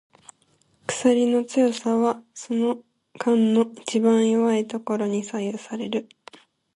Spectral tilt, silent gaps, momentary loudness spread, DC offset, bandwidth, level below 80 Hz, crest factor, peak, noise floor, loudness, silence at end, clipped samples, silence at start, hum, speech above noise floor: -5 dB/octave; none; 11 LU; under 0.1%; 11 kHz; -70 dBFS; 18 dB; -6 dBFS; -64 dBFS; -23 LUFS; 0.75 s; under 0.1%; 0.9 s; none; 42 dB